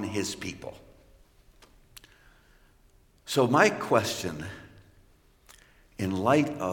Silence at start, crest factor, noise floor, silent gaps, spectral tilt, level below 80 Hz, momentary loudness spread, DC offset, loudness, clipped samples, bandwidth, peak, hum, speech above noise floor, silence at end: 0 s; 24 dB; -61 dBFS; none; -4.5 dB/octave; -60 dBFS; 22 LU; under 0.1%; -27 LUFS; under 0.1%; 17 kHz; -6 dBFS; none; 34 dB; 0 s